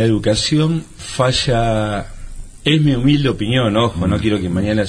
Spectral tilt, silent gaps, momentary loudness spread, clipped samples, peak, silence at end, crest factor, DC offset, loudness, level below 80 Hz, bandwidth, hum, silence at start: -5.5 dB/octave; none; 8 LU; under 0.1%; -2 dBFS; 0 s; 14 dB; under 0.1%; -16 LUFS; -32 dBFS; 10.5 kHz; none; 0 s